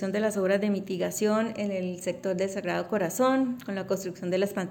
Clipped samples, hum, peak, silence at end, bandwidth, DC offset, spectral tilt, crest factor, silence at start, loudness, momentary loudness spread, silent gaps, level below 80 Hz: under 0.1%; none; -14 dBFS; 0 s; 17 kHz; under 0.1%; -5.5 dB/octave; 14 dB; 0 s; -28 LUFS; 6 LU; none; -70 dBFS